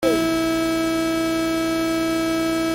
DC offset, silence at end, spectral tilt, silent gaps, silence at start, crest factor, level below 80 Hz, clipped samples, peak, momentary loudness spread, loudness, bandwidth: under 0.1%; 0 s; -4 dB/octave; none; 0 s; 12 dB; -46 dBFS; under 0.1%; -8 dBFS; 1 LU; -21 LUFS; 17 kHz